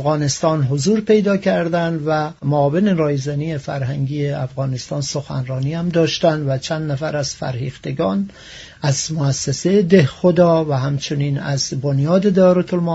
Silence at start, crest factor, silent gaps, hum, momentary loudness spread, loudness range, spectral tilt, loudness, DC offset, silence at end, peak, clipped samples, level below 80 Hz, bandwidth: 0 s; 18 dB; none; none; 10 LU; 5 LU; -6 dB/octave; -18 LUFS; under 0.1%; 0 s; 0 dBFS; under 0.1%; -50 dBFS; 8 kHz